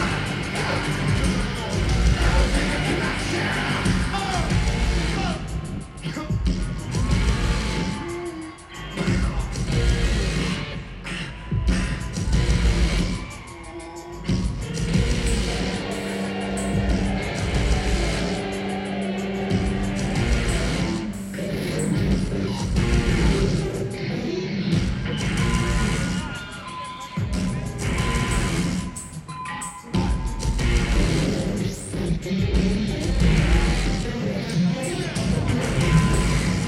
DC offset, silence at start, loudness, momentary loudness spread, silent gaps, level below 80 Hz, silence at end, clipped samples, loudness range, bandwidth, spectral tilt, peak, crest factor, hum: under 0.1%; 0 s; -24 LUFS; 10 LU; none; -28 dBFS; 0 s; under 0.1%; 3 LU; 12.5 kHz; -5.5 dB/octave; -6 dBFS; 16 dB; none